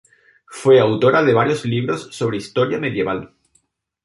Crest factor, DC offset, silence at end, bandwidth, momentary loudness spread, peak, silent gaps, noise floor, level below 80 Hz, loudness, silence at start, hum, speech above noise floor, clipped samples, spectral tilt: 16 dB; under 0.1%; 0.8 s; 11.5 kHz; 10 LU; -2 dBFS; none; -63 dBFS; -56 dBFS; -18 LUFS; 0.5 s; none; 46 dB; under 0.1%; -6.5 dB/octave